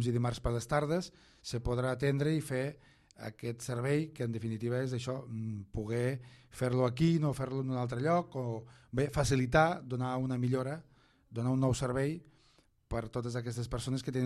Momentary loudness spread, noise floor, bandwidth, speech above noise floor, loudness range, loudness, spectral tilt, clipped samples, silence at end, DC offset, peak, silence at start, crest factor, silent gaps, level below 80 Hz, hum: 11 LU; -68 dBFS; 13 kHz; 34 dB; 4 LU; -34 LUFS; -6.5 dB/octave; under 0.1%; 0 s; under 0.1%; -14 dBFS; 0 s; 20 dB; none; -52 dBFS; none